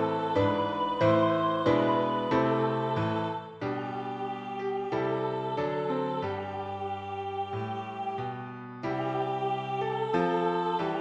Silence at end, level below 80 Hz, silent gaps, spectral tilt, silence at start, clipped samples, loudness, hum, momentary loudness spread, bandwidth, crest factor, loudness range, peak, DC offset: 0 s; -64 dBFS; none; -7.5 dB/octave; 0 s; under 0.1%; -30 LUFS; none; 10 LU; 8.2 kHz; 18 dB; 7 LU; -12 dBFS; under 0.1%